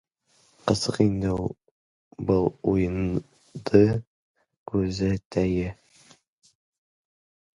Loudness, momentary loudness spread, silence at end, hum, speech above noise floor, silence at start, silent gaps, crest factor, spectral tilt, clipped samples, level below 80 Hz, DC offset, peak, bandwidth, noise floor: -25 LUFS; 13 LU; 1.8 s; none; 41 dB; 0.65 s; 1.71-2.11 s, 4.07-4.35 s, 4.57-4.66 s, 5.25-5.31 s; 24 dB; -7 dB/octave; under 0.1%; -46 dBFS; under 0.1%; -4 dBFS; 11 kHz; -64 dBFS